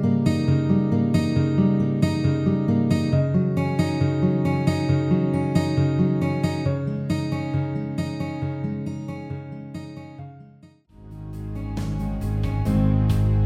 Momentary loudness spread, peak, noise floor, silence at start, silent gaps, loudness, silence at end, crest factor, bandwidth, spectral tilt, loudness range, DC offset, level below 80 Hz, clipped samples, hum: 14 LU; -6 dBFS; -50 dBFS; 0 s; none; -23 LUFS; 0 s; 16 dB; 12.5 kHz; -8.5 dB/octave; 12 LU; under 0.1%; -38 dBFS; under 0.1%; none